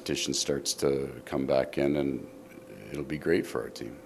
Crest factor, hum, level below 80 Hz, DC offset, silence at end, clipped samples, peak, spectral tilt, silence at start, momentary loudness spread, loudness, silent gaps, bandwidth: 20 dB; none; -56 dBFS; under 0.1%; 0 s; under 0.1%; -12 dBFS; -4 dB/octave; 0 s; 15 LU; -30 LUFS; none; 15.5 kHz